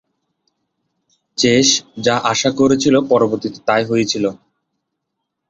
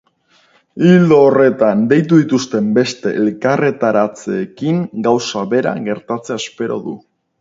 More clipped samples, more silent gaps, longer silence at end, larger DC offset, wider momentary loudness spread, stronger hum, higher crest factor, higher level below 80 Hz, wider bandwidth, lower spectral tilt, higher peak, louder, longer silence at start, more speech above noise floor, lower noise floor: neither; neither; first, 1.15 s vs 0.4 s; neither; second, 7 LU vs 12 LU; neither; about the same, 16 dB vs 14 dB; first, -54 dBFS vs -60 dBFS; about the same, 8.2 kHz vs 7.8 kHz; second, -3.5 dB/octave vs -6.5 dB/octave; about the same, 0 dBFS vs 0 dBFS; about the same, -15 LUFS vs -14 LUFS; first, 1.4 s vs 0.75 s; first, 61 dB vs 41 dB; first, -76 dBFS vs -55 dBFS